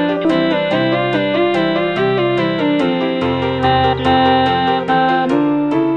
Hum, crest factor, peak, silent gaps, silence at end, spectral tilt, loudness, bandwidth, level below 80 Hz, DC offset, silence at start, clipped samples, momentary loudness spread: none; 14 dB; -2 dBFS; none; 0 s; -7 dB/octave; -15 LUFS; 9 kHz; -42 dBFS; 0.2%; 0 s; under 0.1%; 3 LU